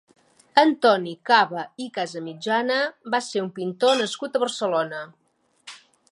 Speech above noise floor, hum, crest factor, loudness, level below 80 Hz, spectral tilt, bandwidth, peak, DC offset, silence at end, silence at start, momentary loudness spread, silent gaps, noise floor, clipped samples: 28 dB; none; 22 dB; -23 LUFS; -80 dBFS; -3.5 dB/octave; 11.5 kHz; 0 dBFS; under 0.1%; 0.35 s; 0.55 s; 13 LU; none; -51 dBFS; under 0.1%